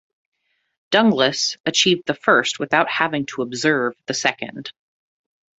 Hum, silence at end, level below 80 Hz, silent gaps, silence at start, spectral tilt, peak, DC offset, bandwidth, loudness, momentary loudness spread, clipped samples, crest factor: none; 0.9 s; -64 dBFS; 1.60-1.64 s; 0.9 s; -3 dB/octave; -2 dBFS; under 0.1%; 8.2 kHz; -19 LUFS; 9 LU; under 0.1%; 20 dB